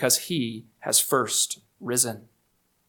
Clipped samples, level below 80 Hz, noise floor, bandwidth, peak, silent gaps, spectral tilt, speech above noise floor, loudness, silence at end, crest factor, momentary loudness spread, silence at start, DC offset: under 0.1%; -72 dBFS; -70 dBFS; 19 kHz; -6 dBFS; none; -2 dB/octave; 44 dB; -23 LUFS; 0.7 s; 20 dB; 14 LU; 0 s; under 0.1%